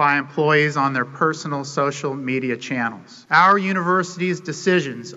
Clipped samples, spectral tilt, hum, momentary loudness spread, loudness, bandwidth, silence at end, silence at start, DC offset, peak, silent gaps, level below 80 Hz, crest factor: under 0.1%; -5 dB/octave; none; 10 LU; -20 LUFS; 8 kHz; 0 s; 0 s; under 0.1%; -2 dBFS; none; -68 dBFS; 18 dB